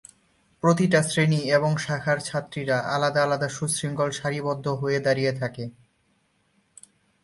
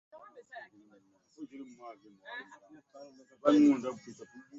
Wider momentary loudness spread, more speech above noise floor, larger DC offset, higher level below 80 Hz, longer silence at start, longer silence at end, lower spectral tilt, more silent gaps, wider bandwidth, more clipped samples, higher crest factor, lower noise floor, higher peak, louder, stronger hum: second, 8 LU vs 29 LU; first, 44 dB vs 33 dB; neither; first, -62 dBFS vs -78 dBFS; about the same, 0.65 s vs 0.55 s; first, 1.5 s vs 0 s; about the same, -5 dB/octave vs -5.5 dB/octave; neither; first, 11.5 kHz vs 7.6 kHz; neither; about the same, 20 dB vs 24 dB; about the same, -68 dBFS vs -66 dBFS; first, -6 dBFS vs -10 dBFS; first, -24 LUFS vs -28 LUFS; neither